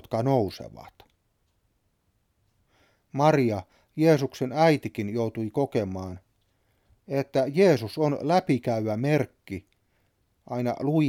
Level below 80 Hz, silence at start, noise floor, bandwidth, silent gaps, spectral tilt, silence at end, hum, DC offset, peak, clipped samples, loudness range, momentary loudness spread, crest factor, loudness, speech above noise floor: -64 dBFS; 0.1 s; -71 dBFS; 16 kHz; none; -7.5 dB/octave; 0 s; none; under 0.1%; -8 dBFS; under 0.1%; 5 LU; 17 LU; 20 dB; -25 LUFS; 47 dB